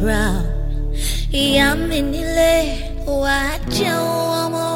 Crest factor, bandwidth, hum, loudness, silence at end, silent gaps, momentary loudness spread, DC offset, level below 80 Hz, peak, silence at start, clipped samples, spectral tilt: 16 dB; 16.5 kHz; none; -19 LUFS; 0 s; none; 9 LU; under 0.1%; -24 dBFS; -2 dBFS; 0 s; under 0.1%; -4.5 dB/octave